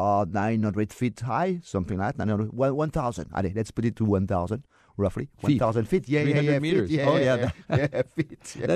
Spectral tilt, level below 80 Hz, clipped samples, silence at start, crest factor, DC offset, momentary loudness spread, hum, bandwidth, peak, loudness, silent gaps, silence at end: -7.5 dB/octave; -50 dBFS; under 0.1%; 0 s; 16 dB; under 0.1%; 7 LU; none; 13.5 kHz; -10 dBFS; -26 LUFS; none; 0 s